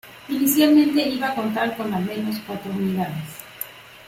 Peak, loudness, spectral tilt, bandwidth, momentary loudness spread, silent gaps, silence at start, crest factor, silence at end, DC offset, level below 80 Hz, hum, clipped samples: -6 dBFS; -21 LUFS; -5 dB/octave; 16.5 kHz; 18 LU; none; 0.05 s; 16 dB; 0 s; under 0.1%; -60 dBFS; none; under 0.1%